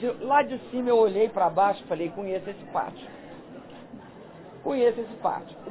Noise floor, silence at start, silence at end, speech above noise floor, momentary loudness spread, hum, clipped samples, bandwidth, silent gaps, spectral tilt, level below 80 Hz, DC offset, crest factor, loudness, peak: -45 dBFS; 0 s; 0 s; 20 dB; 22 LU; none; under 0.1%; 4 kHz; none; -9.5 dB/octave; -66 dBFS; under 0.1%; 18 dB; -26 LUFS; -10 dBFS